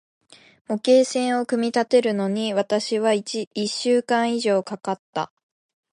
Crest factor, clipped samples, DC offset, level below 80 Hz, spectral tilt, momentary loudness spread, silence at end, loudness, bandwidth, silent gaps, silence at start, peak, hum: 16 dB; under 0.1%; under 0.1%; -76 dBFS; -4.5 dB/octave; 11 LU; 0.65 s; -22 LUFS; 11.5 kHz; 3.47-3.51 s, 4.99-5.13 s; 0.7 s; -6 dBFS; none